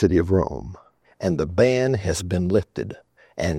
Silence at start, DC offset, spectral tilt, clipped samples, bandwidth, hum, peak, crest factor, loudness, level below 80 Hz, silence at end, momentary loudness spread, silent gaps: 0 s; under 0.1%; -6.5 dB/octave; under 0.1%; 14.5 kHz; none; -4 dBFS; 18 dB; -22 LUFS; -44 dBFS; 0 s; 17 LU; none